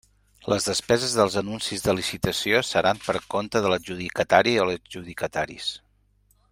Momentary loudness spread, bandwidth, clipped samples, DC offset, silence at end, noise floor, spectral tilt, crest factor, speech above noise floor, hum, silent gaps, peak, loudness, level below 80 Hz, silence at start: 11 LU; 16 kHz; under 0.1%; under 0.1%; 0.75 s; -63 dBFS; -3.5 dB/octave; 24 dB; 39 dB; 50 Hz at -50 dBFS; none; 0 dBFS; -24 LUFS; -54 dBFS; 0.45 s